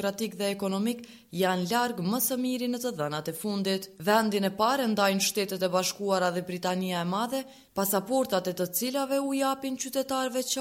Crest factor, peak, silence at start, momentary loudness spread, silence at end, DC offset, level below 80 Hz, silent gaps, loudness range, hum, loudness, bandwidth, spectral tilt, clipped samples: 18 dB; -10 dBFS; 0 s; 7 LU; 0 s; under 0.1%; -70 dBFS; none; 2 LU; none; -28 LUFS; 16.5 kHz; -4 dB/octave; under 0.1%